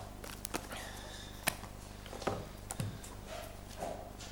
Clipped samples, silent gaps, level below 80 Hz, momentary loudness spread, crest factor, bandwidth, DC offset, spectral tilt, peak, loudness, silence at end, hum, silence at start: under 0.1%; none; -52 dBFS; 10 LU; 34 dB; 19 kHz; under 0.1%; -3.5 dB/octave; -10 dBFS; -43 LUFS; 0 s; 50 Hz at -50 dBFS; 0 s